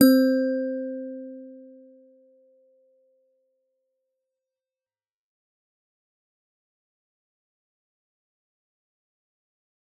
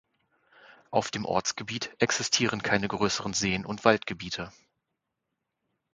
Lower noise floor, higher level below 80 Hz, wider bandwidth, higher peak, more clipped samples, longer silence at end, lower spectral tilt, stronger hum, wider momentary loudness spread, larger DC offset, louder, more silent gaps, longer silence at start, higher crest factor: first, under -90 dBFS vs -83 dBFS; second, -84 dBFS vs -58 dBFS; first, 12 kHz vs 9.6 kHz; about the same, -4 dBFS vs -4 dBFS; neither; first, 8.4 s vs 1.45 s; about the same, -4 dB/octave vs -3 dB/octave; neither; first, 25 LU vs 10 LU; neither; first, -24 LUFS vs -28 LUFS; neither; second, 0 s vs 0.9 s; about the same, 26 dB vs 26 dB